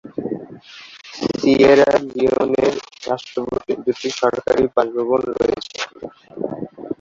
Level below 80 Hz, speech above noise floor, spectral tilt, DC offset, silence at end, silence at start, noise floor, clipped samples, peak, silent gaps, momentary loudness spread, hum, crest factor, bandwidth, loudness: -50 dBFS; 23 dB; -5 dB/octave; under 0.1%; 0.05 s; 0.05 s; -41 dBFS; under 0.1%; -2 dBFS; none; 19 LU; none; 18 dB; 7.6 kHz; -19 LUFS